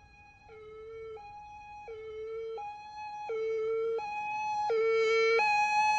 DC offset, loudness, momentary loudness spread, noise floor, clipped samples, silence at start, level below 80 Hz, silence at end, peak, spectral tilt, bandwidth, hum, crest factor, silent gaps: under 0.1%; -31 LUFS; 22 LU; -56 dBFS; under 0.1%; 0.2 s; -66 dBFS; 0 s; -18 dBFS; -1.5 dB/octave; 8.2 kHz; none; 14 dB; none